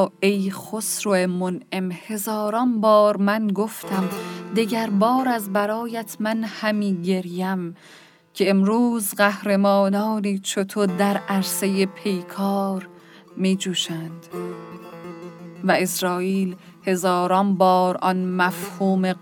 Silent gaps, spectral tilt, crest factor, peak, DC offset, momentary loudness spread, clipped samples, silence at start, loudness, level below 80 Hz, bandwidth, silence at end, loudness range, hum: none; -5 dB/octave; 18 dB; -4 dBFS; under 0.1%; 13 LU; under 0.1%; 0 s; -22 LUFS; -74 dBFS; 19.5 kHz; 0.05 s; 5 LU; none